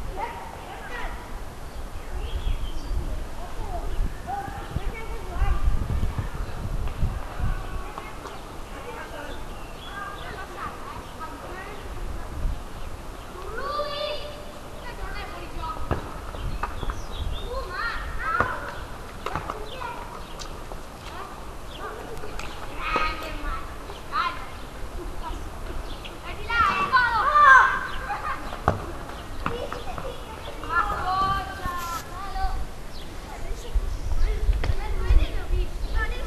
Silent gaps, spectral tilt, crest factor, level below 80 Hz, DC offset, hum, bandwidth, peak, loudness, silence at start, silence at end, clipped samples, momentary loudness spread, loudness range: none; -4.5 dB/octave; 24 dB; -32 dBFS; under 0.1%; none; 13.5 kHz; -2 dBFS; -28 LUFS; 0 s; 0 s; under 0.1%; 13 LU; 15 LU